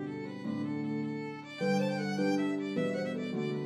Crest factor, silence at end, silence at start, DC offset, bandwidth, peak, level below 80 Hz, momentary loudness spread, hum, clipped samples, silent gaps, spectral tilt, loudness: 14 dB; 0 s; 0 s; under 0.1%; 12.5 kHz; -20 dBFS; -80 dBFS; 8 LU; none; under 0.1%; none; -6.5 dB/octave; -34 LUFS